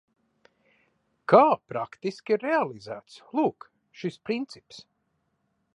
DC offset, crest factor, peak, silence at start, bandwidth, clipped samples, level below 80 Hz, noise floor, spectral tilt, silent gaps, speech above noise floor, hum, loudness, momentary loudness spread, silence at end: under 0.1%; 24 dB; -4 dBFS; 1.3 s; 11 kHz; under 0.1%; -76 dBFS; -75 dBFS; -6.5 dB/octave; none; 49 dB; none; -26 LUFS; 22 LU; 0.95 s